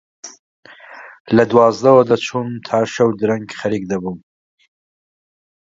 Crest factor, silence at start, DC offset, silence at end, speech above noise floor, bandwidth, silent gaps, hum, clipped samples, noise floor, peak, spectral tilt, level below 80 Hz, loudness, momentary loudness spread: 18 dB; 0.25 s; under 0.1%; 1.6 s; 24 dB; 7.8 kHz; 0.39-0.63 s, 1.20-1.25 s; none; under 0.1%; -39 dBFS; 0 dBFS; -6 dB/octave; -58 dBFS; -16 LUFS; 25 LU